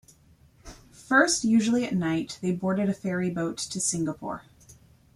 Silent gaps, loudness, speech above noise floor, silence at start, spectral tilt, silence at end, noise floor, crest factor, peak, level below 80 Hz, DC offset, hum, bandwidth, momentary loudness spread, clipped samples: none; -26 LUFS; 32 dB; 0.65 s; -4 dB/octave; 0.4 s; -58 dBFS; 22 dB; -6 dBFS; -58 dBFS; under 0.1%; none; 13.5 kHz; 10 LU; under 0.1%